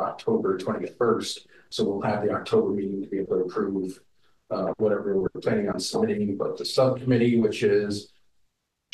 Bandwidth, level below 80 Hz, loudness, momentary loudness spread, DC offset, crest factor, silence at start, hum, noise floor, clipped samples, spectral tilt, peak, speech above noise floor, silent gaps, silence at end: 12.5 kHz; -62 dBFS; -26 LUFS; 9 LU; under 0.1%; 18 dB; 0 s; none; -72 dBFS; under 0.1%; -6 dB/octave; -8 dBFS; 47 dB; none; 0.9 s